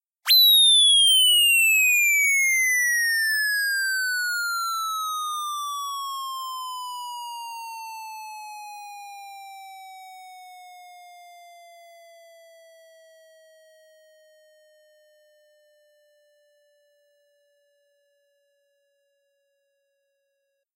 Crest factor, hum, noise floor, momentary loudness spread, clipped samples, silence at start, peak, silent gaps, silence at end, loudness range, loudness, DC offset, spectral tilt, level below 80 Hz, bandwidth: 14 dB; none; -76 dBFS; 26 LU; under 0.1%; 0.25 s; -12 dBFS; none; 9.65 s; 27 LU; -18 LUFS; under 0.1%; 12.5 dB/octave; under -90 dBFS; 16 kHz